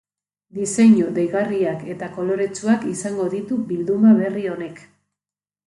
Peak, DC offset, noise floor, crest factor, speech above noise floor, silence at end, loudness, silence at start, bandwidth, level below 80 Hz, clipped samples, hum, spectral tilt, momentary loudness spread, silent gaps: -4 dBFS; under 0.1%; under -90 dBFS; 16 dB; over 71 dB; 0.9 s; -20 LUFS; 0.55 s; 11.5 kHz; -64 dBFS; under 0.1%; 50 Hz at -45 dBFS; -6.5 dB/octave; 14 LU; none